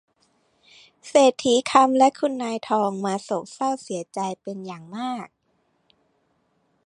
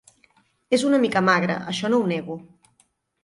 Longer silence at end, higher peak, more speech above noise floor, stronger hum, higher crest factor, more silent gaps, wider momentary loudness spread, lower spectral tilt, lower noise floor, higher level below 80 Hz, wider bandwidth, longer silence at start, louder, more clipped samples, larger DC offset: first, 1.6 s vs 0.8 s; first, -2 dBFS vs -6 dBFS; about the same, 47 dB vs 44 dB; neither; about the same, 22 dB vs 18 dB; neither; first, 17 LU vs 11 LU; about the same, -4 dB/octave vs -5 dB/octave; first, -69 dBFS vs -65 dBFS; second, -72 dBFS vs -64 dBFS; about the same, 11 kHz vs 11.5 kHz; first, 1.05 s vs 0.7 s; about the same, -22 LUFS vs -21 LUFS; neither; neither